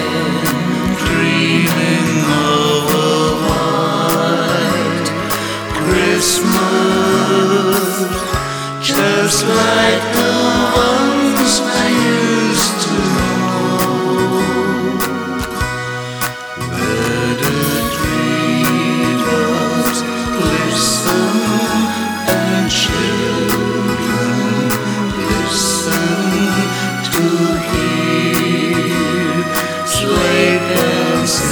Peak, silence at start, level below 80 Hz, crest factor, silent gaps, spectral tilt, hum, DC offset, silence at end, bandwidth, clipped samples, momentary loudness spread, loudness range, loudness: 0 dBFS; 0 s; -36 dBFS; 14 dB; none; -4 dB/octave; none; under 0.1%; 0 s; over 20 kHz; under 0.1%; 5 LU; 3 LU; -14 LUFS